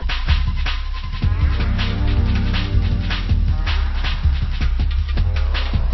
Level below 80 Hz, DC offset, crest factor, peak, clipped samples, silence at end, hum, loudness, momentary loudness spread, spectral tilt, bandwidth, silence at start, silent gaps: -18 dBFS; under 0.1%; 14 dB; -4 dBFS; under 0.1%; 0 s; none; -21 LUFS; 3 LU; -7 dB/octave; 6 kHz; 0 s; none